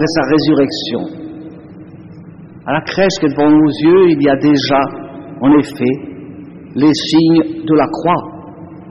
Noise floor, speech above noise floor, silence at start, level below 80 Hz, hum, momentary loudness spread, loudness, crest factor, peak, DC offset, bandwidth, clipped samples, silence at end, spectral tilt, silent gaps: -34 dBFS; 23 dB; 0 s; -48 dBFS; none; 21 LU; -13 LUFS; 12 dB; -2 dBFS; under 0.1%; 9.2 kHz; under 0.1%; 0 s; -6 dB/octave; none